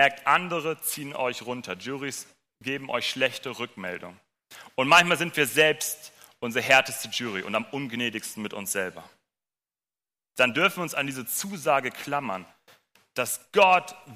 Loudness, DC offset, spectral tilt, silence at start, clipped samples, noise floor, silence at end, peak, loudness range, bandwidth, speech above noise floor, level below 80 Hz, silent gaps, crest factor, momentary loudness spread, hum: -25 LUFS; under 0.1%; -2.5 dB/octave; 0 s; under 0.1%; under -90 dBFS; 0 s; -6 dBFS; 9 LU; 15.5 kHz; over 64 dB; -70 dBFS; none; 20 dB; 15 LU; none